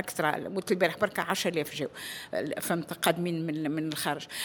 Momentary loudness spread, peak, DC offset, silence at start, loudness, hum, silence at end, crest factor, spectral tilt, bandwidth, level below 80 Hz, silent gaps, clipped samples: 7 LU; -8 dBFS; under 0.1%; 0 s; -30 LUFS; none; 0 s; 24 dB; -4 dB/octave; over 20 kHz; -70 dBFS; none; under 0.1%